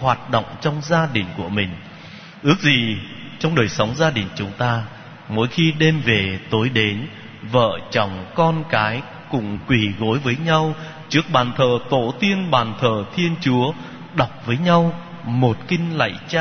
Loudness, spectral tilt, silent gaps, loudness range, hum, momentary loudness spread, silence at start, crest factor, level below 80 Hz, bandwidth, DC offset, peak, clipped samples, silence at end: -20 LUFS; -6 dB/octave; none; 1 LU; none; 10 LU; 0 s; 20 dB; -50 dBFS; 6.6 kHz; under 0.1%; 0 dBFS; under 0.1%; 0 s